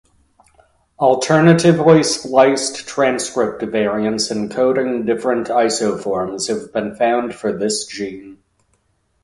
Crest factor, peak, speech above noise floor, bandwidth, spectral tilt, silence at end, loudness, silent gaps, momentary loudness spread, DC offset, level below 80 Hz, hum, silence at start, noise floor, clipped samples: 18 dB; 0 dBFS; 47 dB; 11.5 kHz; -5 dB/octave; 0.9 s; -17 LUFS; none; 10 LU; under 0.1%; -54 dBFS; none; 1 s; -63 dBFS; under 0.1%